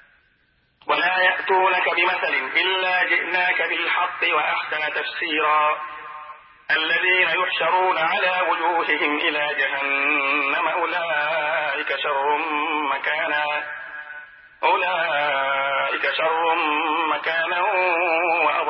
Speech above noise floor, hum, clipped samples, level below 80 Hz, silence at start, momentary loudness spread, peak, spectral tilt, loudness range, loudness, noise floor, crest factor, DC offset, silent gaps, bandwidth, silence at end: 42 dB; none; under 0.1%; -74 dBFS; 0.85 s; 6 LU; -4 dBFS; -7 dB/octave; 3 LU; -20 LUFS; -63 dBFS; 16 dB; under 0.1%; none; 5.8 kHz; 0 s